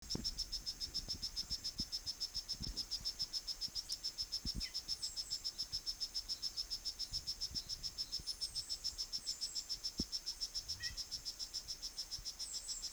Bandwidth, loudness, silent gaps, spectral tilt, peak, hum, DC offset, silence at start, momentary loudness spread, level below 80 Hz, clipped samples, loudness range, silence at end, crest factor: over 20 kHz; -41 LUFS; none; -1 dB/octave; -26 dBFS; none; under 0.1%; 0 s; 3 LU; -58 dBFS; under 0.1%; 1 LU; 0 s; 18 dB